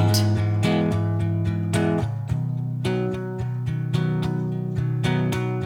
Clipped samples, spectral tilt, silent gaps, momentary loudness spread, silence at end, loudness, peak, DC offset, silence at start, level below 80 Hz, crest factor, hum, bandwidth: under 0.1%; -6.5 dB/octave; none; 6 LU; 0 s; -24 LUFS; -8 dBFS; under 0.1%; 0 s; -46 dBFS; 16 dB; none; 16.5 kHz